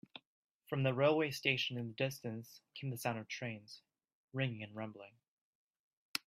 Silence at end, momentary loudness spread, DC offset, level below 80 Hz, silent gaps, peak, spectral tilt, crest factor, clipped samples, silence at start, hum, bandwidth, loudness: 0.1 s; 22 LU; under 0.1%; -80 dBFS; 0.27-0.43 s, 0.51-0.60 s, 4.13-4.28 s, 5.28-5.71 s, 5.79-6.14 s; -16 dBFS; -5 dB/octave; 26 dB; under 0.1%; 0.15 s; none; 15.5 kHz; -38 LUFS